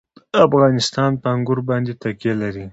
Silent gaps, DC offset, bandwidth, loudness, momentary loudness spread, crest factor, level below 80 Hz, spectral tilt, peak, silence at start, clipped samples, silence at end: none; under 0.1%; 8 kHz; -18 LUFS; 10 LU; 18 dB; -52 dBFS; -6 dB/octave; 0 dBFS; 0.35 s; under 0.1%; 0 s